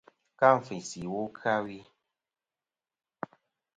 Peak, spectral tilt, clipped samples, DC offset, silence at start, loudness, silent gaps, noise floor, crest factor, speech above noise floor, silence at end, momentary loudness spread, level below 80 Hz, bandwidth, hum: -8 dBFS; -5 dB/octave; under 0.1%; under 0.1%; 0.4 s; -29 LUFS; none; under -90 dBFS; 24 dB; over 62 dB; 1.95 s; 20 LU; -72 dBFS; 9.4 kHz; none